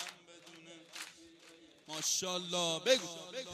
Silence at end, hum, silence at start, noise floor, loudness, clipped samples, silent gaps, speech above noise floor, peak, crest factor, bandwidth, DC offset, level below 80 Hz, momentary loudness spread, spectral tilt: 0 s; none; 0 s; -60 dBFS; -34 LUFS; under 0.1%; none; 25 dB; -16 dBFS; 22 dB; 15.5 kHz; under 0.1%; -84 dBFS; 23 LU; -1.5 dB/octave